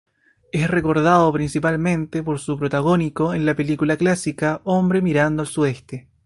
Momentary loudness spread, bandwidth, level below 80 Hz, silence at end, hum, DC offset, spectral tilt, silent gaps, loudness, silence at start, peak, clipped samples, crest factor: 8 LU; 11.5 kHz; -48 dBFS; 0.25 s; none; under 0.1%; -6.5 dB/octave; none; -20 LUFS; 0.55 s; -2 dBFS; under 0.1%; 18 dB